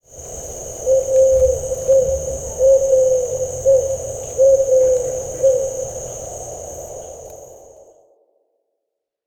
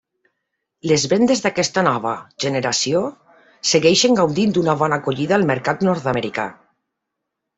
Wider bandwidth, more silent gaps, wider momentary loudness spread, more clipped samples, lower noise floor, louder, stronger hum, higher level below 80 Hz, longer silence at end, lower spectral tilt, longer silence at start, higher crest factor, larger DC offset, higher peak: first, 17 kHz vs 8.4 kHz; neither; first, 17 LU vs 10 LU; neither; about the same, -79 dBFS vs -79 dBFS; about the same, -17 LUFS vs -18 LUFS; neither; first, -40 dBFS vs -58 dBFS; first, 1.65 s vs 1.05 s; about the same, -4.5 dB/octave vs -4 dB/octave; second, 0.15 s vs 0.85 s; about the same, 14 dB vs 18 dB; neither; about the same, -4 dBFS vs -2 dBFS